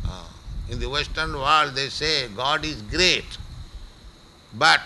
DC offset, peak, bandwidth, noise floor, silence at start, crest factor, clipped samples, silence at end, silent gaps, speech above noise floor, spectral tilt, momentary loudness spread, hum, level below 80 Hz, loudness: under 0.1%; -4 dBFS; 12 kHz; -47 dBFS; 0 s; 22 dB; under 0.1%; 0 s; none; 25 dB; -2.5 dB/octave; 21 LU; none; -38 dBFS; -22 LUFS